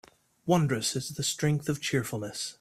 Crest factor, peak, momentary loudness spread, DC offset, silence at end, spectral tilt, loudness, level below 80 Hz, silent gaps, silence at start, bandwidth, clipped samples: 20 dB; -10 dBFS; 9 LU; under 0.1%; 0.1 s; -4.5 dB/octave; -29 LUFS; -62 dBFS; none; 0.45 s; 15.5 kHz; under 0.1%